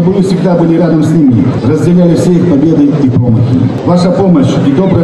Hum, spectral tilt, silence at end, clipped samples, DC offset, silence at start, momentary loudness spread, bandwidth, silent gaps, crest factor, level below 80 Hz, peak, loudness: none; -8.5 dB/octave; 0 s; under 0.1%; 0.2%; 0 s; 2 LU; 11 kHz; none; 6 dB; -36 dBFS; 0 dBFS; -8 LUFS